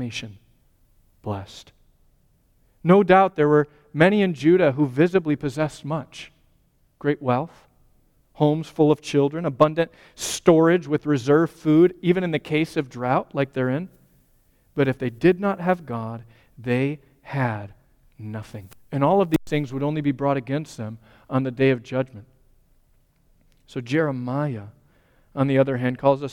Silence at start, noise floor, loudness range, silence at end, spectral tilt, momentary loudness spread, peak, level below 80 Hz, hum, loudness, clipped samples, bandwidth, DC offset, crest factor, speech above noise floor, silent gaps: 0 s; -62 dBFS; 8 LU; 0 s; -7 dB/octave; 17 LU; -2 dBFS; -56 dBFS; none; -22 LUFS; under 0.1%; 17 kHz; under 0.1%; 20 dB; 41 dB; none